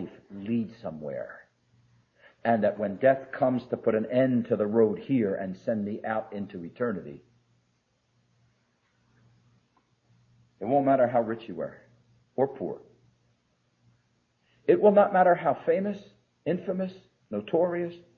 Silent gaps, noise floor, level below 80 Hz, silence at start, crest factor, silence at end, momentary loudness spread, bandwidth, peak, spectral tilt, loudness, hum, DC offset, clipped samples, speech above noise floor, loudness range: none; -72 dBFS; -72 dBFS; 0 s; 20 dB; 0.2 s; 16 LU; 6.4 kHz; -8 dBFS; -9.5 dB/octave; -27 LUFS; none; under 0.1%; under 0.1%; 46 dB; 11 LU